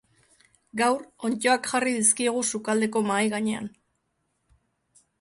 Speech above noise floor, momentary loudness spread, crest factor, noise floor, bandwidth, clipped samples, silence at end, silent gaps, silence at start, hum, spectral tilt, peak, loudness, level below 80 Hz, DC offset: 50 dB; 10 LU; 20 dB; -75 dBFS; 11.5 kHz; under 0.1%; 1.5 s; none; 0.75 s; none; -2.5 dB/octave; -6 dBFS; -24 LUFS; -70 dBFS; under 0.1%